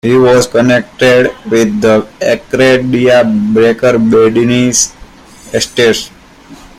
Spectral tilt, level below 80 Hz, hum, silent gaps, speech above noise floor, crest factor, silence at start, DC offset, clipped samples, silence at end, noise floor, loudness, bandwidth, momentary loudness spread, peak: -4.5 dB/octave; -42 dBFS; none; none; 27 dB; 10 dB; 0.05 s; under 0.1%; under 0.1%; 0.25 s; -35 dBFS; -9 LUFS; 15.5 kHz; 6 LU; 0 dBFS